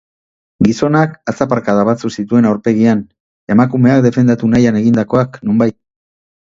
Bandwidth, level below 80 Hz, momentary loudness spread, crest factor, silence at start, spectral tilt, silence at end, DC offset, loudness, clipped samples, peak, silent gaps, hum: 7.6 kHz; -46 dBFS; 6 LU; 14 dB; 0.6 s; -8 dB/octave; 0.8 s; under 0.1%; -13 LUFS; under 0.1%; 0 dBFS; 3.20-3.47 s; none